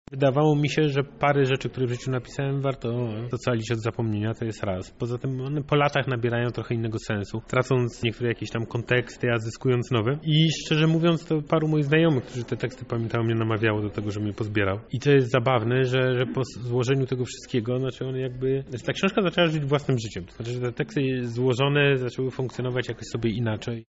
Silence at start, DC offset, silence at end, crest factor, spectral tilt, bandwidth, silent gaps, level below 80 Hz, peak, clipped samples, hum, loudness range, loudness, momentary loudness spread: 0.1 s; under 0.1%; 0.05 s; 16 dB; -5.5 dB/octave; 8 kHz; none; -52 dBFS; -8 dBFS; under 0.1%; none; 4 LU; -25 LUFS; 9 LU